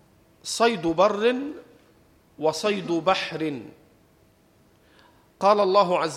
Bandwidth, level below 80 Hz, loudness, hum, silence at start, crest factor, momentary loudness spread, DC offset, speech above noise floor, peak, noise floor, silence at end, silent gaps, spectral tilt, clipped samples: 15 kHz; -64 dBFS; -23 LUFS; none; 0.45 s; 20 dB; 14 LU; under 0.1%; 37 dB; -6 dBFS; -59 dBFS; 0 s; none; -4 dB/octave; under 0.1%